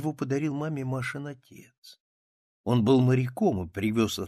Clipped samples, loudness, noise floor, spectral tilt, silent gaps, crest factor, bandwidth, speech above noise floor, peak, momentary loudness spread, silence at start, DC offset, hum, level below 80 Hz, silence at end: under 0.1%; -27 LUFS; under -90 dBFS; -7 dB/octave; 1.78-1.82 s, 2.00-2.64 s; 18 dB; 14 kHz; over 63 dB; -10 dBFS; 16 LU; 0 s; under 0.1%; none; -60 dBFS; 0 s